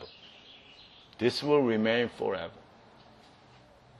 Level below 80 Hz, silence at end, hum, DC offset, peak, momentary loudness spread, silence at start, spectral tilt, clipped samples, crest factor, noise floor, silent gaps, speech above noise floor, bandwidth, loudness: -68 dBFS; 1.4 s; none; under 0.1%; -12 dBFS; 25 LU; 0 s; -6 dB/octave; under 0.1%; 20 dB; -57 dBFS; none; 29 dB; 12 kHz; -29 LUFS